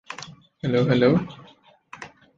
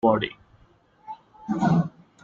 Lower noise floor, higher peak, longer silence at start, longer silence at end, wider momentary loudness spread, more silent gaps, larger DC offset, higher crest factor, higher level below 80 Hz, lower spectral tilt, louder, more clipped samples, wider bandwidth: second, -54 dBFS vs -58 dBFS; about the same, -6 dBFS vs -6 dBFS; about the same, 0.1 s vs 0.05 s; about the same, 0.3 s vs 0.35 s; first, 23 LU vs 20 LU; neither; neither; about the same, 18 dB vs 20 dB; about the same, -58 dBFS vs -58 dBFS; about the same, -7.5 dB/octave vs -8 dB/octave; first, -21 LUFS vs -25 LUFS; neither; about the same, 7.6 kHz vs 7.4 kHz